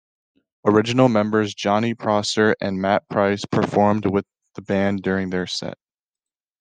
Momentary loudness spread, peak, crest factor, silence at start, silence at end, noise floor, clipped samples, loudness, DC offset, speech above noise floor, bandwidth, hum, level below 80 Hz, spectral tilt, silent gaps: 8 LU; -4 dBFS; 18 dB; 0.65 s; 0.85 s; under -90 dBFS; under 0.1%; -20 LUFS; under 0.1%; over 70 dB; 9.6 kHz; none; -62 dBFS; -5.5 dB/octave; none